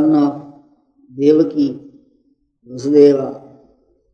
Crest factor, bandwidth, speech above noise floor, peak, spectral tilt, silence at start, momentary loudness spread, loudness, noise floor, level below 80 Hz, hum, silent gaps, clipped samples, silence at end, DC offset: 16 dB; 6.8 kHz; 46 dB; 0 dBFS; -8 dB/octave; 0 s; 24 LU; -15 LUFS; -60 dBFS; -64 dBFS; none; none; under 0.1%; 0.75 s; under 0.1%